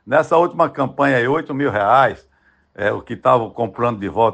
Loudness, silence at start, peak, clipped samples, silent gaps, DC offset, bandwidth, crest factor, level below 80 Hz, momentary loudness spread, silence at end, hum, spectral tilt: -17 LUFS; 0.05 s; 0 dBFS; under 0.1%; none; under 0.1%; 9 kHz; 16 dB; -54 dBFS; 8 LU; 0 s; none; -7 dB/octave